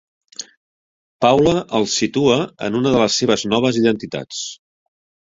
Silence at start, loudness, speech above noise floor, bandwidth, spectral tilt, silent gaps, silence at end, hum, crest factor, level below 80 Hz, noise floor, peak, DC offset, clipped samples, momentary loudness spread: 0.4 s; -17 LUFS; over 73 dB; 7.8 kHz; -4.5 dB/octave; 0.57-1.20 s; 0.8 s; none; 18 dB; -50 dBFS; under -90 dBFS; -2 dBFS; under 0.1%; under 0.1%; 18 LU